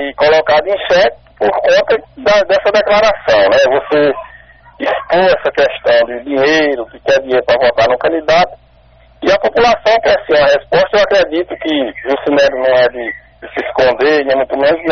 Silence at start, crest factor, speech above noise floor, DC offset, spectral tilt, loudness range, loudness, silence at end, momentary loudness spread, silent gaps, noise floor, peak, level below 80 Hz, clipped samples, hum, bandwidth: 0 s; 10 dB; 34 dB; under 0.1%; -1.5 dB/octave; 2 LU; -12 LUFS; 0 s; 7 LU; none; -45 dBFS; -2 dBFS; -42 dBFS; under 0.1%; none; 6.6 kHz